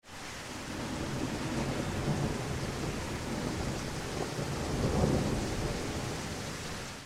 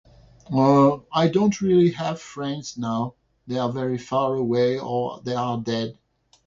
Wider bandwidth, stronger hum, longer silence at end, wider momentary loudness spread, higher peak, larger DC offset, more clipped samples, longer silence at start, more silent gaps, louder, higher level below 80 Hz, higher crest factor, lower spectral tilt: first, 16 kHz vs 7.6 kHz; neither; second, 0 s vs 0.55 s; second, 8 LU vs 12 LU; second, -12 dBFS vs -4 dBFS; neither; neither; second, 0.05 s vs 0.5 s; neither; second, -35 LUFS vs -23 LUFS; first, -44 dBFS vs -58 dBFS; about the same, 22 dB vs 18 dB; second, -5 dB/octave vs -7 dB/octave